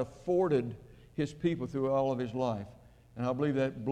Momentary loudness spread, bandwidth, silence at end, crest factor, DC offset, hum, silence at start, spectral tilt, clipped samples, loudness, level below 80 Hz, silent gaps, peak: 14 LU; 10 kHz; 0 s; 14 dB; under 0.1%; none; 0 s; -8 dB/octave; under 0.1%; -32 LUFS; -60 dBFS; none; -18 dBFS